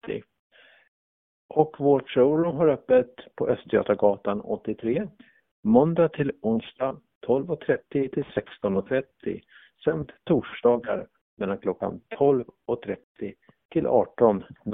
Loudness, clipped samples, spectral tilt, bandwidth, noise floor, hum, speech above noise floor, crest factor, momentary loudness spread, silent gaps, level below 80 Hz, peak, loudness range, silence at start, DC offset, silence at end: -25 LUFS; under 0.1%; -11.5 dB/octave; 3.9 kHz; under -90 dBFS; none; over 66 dB; 22 dB; 13 LU; 0.39-0.50 s, 0.88-1.49 s, 5.51-5.63 s, 7.15-7.21 s, 11.21-11.37 s, 13.03-13.15 s, 13.65-13.69 s; -58 dBFS; -4 dBFS; 5 LU; 0.05 s; under 0.1%; 0 s